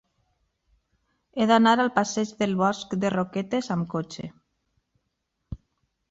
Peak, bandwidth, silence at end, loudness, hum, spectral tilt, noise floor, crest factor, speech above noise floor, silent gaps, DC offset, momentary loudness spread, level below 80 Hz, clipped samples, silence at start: -6 dBFS; 8 kHz; 0.55 s; -24 LUFS; none; -5.5 dB/octave; -78 dBFS; 20 dB; 54 dB; none; under 0.1%; 23 LU; -56 dBFS; under 0.1%; 1.35 s